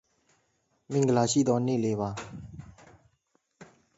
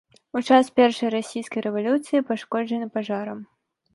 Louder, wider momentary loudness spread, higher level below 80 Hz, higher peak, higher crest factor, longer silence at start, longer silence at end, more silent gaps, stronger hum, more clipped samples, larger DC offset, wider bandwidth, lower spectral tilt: second, -27 LUFS vs -23 LUFS; first, 21 LU vs 11 LU; first, -62 dBFS vs -70 dBFS; second, -10 dBFS vs -4 dBFS; about the same, 20 dB vs 20 dB; first, 0.9 s vs 0.35 s; second, 0.35 s vs 0.5 s; neither; neither; neither; neither; second, 8 kHz vs 11.5 kHz; about the same, -5.5 dB/octave vs -5 dB/octave